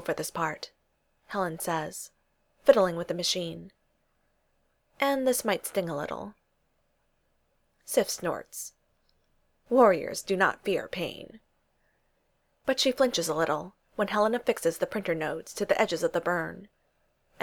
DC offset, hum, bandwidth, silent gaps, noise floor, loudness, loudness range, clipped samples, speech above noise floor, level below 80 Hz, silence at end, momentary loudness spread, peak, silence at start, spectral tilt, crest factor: under 0.1%; none; over 20 kHz; none; -72 dBFS; -28 LUFS; 5 LU; under 0.1%; 45 dB; -64 dBFS; 0.75 s; 16 LU; -6 dBFS; 0 s; -3.5 dB/octave; 24 dB